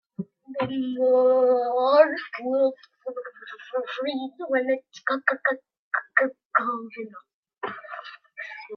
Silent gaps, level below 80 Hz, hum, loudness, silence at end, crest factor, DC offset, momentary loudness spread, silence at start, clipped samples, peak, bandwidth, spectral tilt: 5.79-5.91 s, 6.45-6.50 s, 7.34-7.43 s; -78 dBFS; none; -24 LUFS; 0 s; 22 dB; under 0.1%; 19 LU; 0.2 s; under 0.1%; -4 dBFS; 6.4 kHz; -6 dB/octave